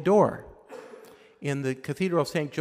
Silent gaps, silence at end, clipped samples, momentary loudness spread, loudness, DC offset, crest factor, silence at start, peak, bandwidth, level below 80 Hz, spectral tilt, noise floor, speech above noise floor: none; 0 s; under 0.1%; 23 LU; -27 LUFS; under 0.1%; 18 dB; 0 s; -8 dBFS; 15.5 kHz; -64 dBFS; -6.5 dB/octave; -50 dBFS; 25 dB